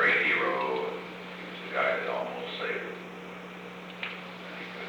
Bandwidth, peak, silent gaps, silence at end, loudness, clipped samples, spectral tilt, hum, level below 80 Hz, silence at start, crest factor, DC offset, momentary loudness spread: over 20 kHz; -14 dBFS; none; 0 s; -31 LUFS; under 0.1%; -5 dB/octave; 60 Hz at -50 dBFS; -72 dBFS; 0 s; 18 dB; under 0.1%; 16 LU